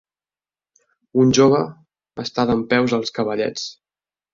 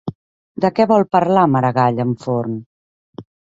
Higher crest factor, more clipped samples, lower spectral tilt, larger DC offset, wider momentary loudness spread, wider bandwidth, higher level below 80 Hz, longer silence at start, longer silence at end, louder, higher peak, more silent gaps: about the same, 18 dB vs 16 dB; neither; second, -5 dB/octave vs -8.5 dB/octave; neither; about the same, 16 LU vs 15 LU; about the same, 7.6 kHz vs 7.8 kHz; about the same, -54 dBFS vs -56 dBFS; first, 1.15 s vs 0.05 s; first, 0.6 s vs 0.35 s; second, -19 LUFS vs -16 LUFS; about the same, -2 dBFS vs 0 dBFS; second, none vs 0.15-0.55 s, 2.66-3.13 s